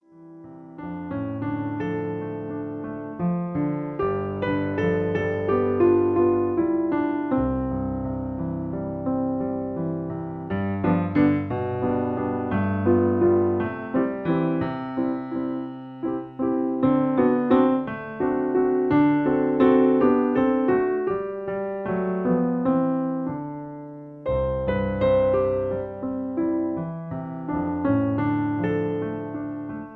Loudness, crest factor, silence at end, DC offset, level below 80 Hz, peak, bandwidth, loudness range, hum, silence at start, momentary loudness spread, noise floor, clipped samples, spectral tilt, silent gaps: -24 LUFS; 18 dB; 0 s; under 0.1%; -48 dBFS; -6 dBFS; 4.3 kHz; 6 LU; none; 0.15 s; 12 LU; -45 dBFS; under 0.1%; -10.5 dB/octave; none